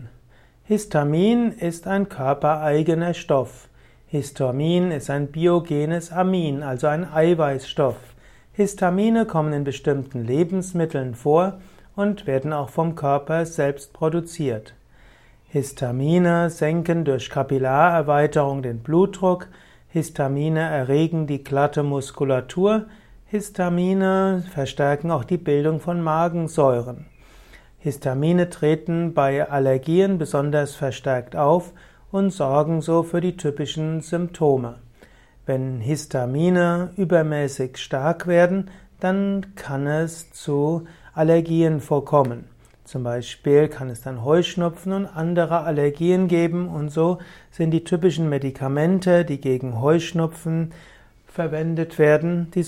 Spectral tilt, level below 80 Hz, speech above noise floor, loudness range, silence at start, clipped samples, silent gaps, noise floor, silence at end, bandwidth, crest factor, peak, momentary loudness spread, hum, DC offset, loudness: -7 dB/octave; -52 dBFS; 31 dB; 2 LU; 0 s; under 0.1%; none; -52 dBFS; 0 s; 14 kHz; 18 dB; -4 dBFS; 9 LU; none; under 0.1%; -22 LUFS